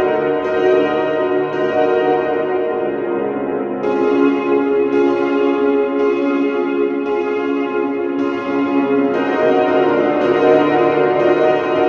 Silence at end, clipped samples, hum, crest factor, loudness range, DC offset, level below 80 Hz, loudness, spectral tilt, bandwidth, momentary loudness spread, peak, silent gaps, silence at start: 0 s; under 0.1%; none; 16 dB; 3 LU; under 0.1%; -56 dBFS; -16 LUFS; -7 dB/octave; 6.6 kHz; 5 LU; 0 dBFS; none; 0 s